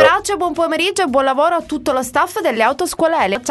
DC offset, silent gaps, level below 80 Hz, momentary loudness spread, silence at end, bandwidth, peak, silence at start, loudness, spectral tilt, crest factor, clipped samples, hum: under 0.1%; none; -48 dBFS; 4 LU; 0 s; 12.5 kHz; 0 dBFS; 0 s; -16 LUFS; -3 dB/octave; 16 dB; under 0.1%; none